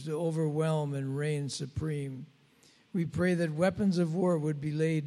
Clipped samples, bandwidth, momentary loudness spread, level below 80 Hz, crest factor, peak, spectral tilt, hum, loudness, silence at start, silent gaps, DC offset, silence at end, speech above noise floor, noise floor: under 0.1%; 12.5 kHz; 8 LU; -62 dBFS; 18 dB; -14 dBFS; -7 dB/octave; none; -31 LUFS; 0 s; none; under 0.1%; 0 s; 33 dB; -63 dBFS